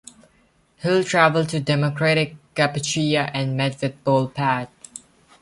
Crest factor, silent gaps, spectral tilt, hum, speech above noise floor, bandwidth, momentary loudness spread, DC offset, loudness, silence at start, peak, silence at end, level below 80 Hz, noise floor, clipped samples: 20 dB; none; -5 dB/octave; none; 40 dB; 11.5 kHz; 11 LU; under 0.1%; -21 LUFS; 0.8 s; -2 dBFS; 0.45 s; -60 dBFS; -60 dBFS; under 0.1%